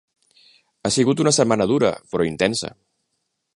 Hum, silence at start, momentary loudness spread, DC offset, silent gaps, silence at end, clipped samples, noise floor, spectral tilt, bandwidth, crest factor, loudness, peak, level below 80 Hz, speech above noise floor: none; 0.85 s; 10 LU; under 0.1%; none; 0.85 s; under 0.1%; -75 dBFS; -4.5 dB/octave; 11.5 kHz; 20 dB; -20 LUFS; -2 dBFS; -54 dBFS; 56 dB